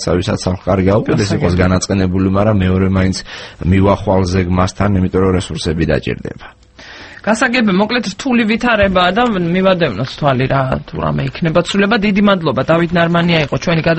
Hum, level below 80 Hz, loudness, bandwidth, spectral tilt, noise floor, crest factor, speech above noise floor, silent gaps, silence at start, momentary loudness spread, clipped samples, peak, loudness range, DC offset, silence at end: none; -34 dBFS; -14 LUFS; 8.8 kHz; -6 dB/octave; -36 dBFS; 14 dB; 22 dB; none; 0 s; 7 LU; under 0.1%; 0 dBFS; 3 LU; under 0.1%; 0 s